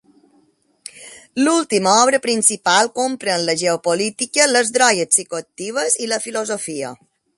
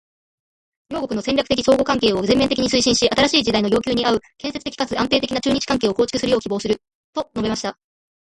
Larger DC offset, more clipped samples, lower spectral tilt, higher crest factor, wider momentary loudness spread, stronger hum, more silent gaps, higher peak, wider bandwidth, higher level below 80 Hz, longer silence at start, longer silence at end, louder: neither; neither; second, -1.5 dB/octave vs -3.5 dB/octave; about the same, 18 dB vs 18 dB; first, 14 LU vs 11 LU; neither; second, none vs 6.95-7.13 s; about the same, 0 dBFS vs -2 dBFS; about the same, 12 kHz vs 11.5 kHz; second, -68 dBFS vs -46 dBFS; about the same, 0.95 s vs 0.9 s; about the same, 0.45 s vs 0.55 s; about the same, -17 LUFS vs -19 LUFS